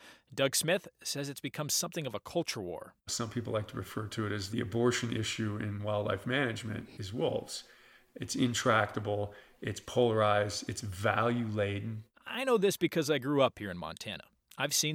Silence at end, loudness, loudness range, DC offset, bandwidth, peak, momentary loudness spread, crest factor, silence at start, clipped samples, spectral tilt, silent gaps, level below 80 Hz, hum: 0 s; -33 LUFS; 4 LU; under 0.1%; 17 kHz; -12 dBFS; 13 LU; 22 dB; 0 s; under 0.1%; -4 dB/octave; none; -68 dBFS; none